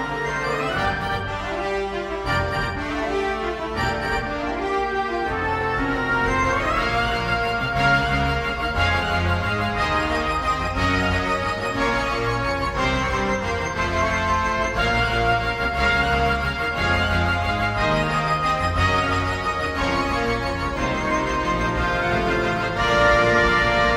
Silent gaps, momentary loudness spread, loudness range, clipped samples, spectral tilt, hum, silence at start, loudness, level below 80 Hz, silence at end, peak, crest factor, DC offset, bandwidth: none; 6 LU; 4 LU; under 0.1%; -5 dB/octave; none; 0 s; -21 LUFS; -34 dBFS; 0 s; -6 dBFS; 16 dB; under 0.1%; 16 kHz